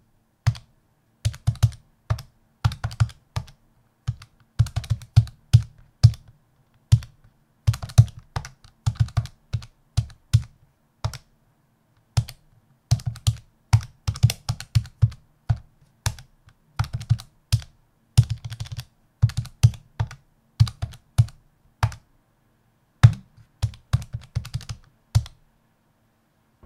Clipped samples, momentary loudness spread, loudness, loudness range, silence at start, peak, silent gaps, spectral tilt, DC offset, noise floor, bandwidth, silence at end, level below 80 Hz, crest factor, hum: under 0.1%; 16 LU; -25 LUFS; 6 LU; 0.45 s; 0 dBFS; none; -5.5 dB/octave; under 0.1%; -65 dBFS; 14.5 kHz; 1.4 s; -38 dBFS; 26 dB; none